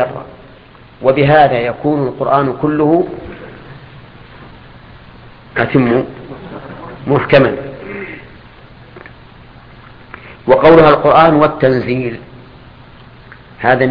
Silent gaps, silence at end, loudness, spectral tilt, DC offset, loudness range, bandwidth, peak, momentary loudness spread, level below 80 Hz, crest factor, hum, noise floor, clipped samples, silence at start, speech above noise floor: none; 0 s; -11 LUFS; -9.5 dB/octave; under 0.1%; 9 LU; 5.4 kHz; 0 dBFS; 23 LU; -42 dBFS; 14 dB; none; -40 dBFS; 0.1%; 0 s; 29 dB